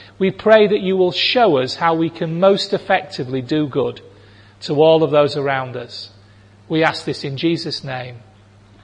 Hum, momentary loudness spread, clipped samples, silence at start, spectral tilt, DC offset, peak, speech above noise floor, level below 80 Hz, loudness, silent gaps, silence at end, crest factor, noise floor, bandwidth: none; 16 LU; under 0.1%; 0 s; -6 dB/octave; under 0.1%; 0 dBFS; 30 dB; -60 dBFS; -17 LUFS; none; 0.65 s; 18 dB; -47 dBFS; 10 kHz